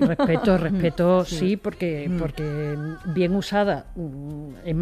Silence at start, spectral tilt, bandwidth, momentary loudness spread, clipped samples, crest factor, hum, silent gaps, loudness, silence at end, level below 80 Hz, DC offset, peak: 0 s; -7 dB/octave; 14 kHz; 13 LU; under 0.1%; 16 dB; none; none; -23 LUFS; 0 s; -42 dBFS; under 0.1%; -6 dBFS